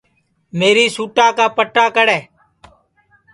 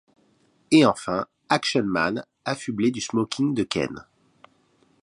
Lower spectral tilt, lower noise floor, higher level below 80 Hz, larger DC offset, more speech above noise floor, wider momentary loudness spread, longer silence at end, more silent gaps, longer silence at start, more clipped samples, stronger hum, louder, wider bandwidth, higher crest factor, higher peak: second, -3 dB/octave vs -5 dB/octave; about the same, -62 dBFS vs -63 dBFS; about the same, -62 dBFS vs -60 dBFS; neither; first, 48 dB vs 40 dB; second, 5 LU vs 12 LU; about the same, 1.1 s vs 1 s; neither; second, 0.55 s vs 0.7 s; neither; neither; first, -14 LUFS vs -24 LUFS; about the same, 11.5 kHz vs 11.5 kHz; second, 16 dB vs 22 dB; first, 0 dBFS vs -4 dBFS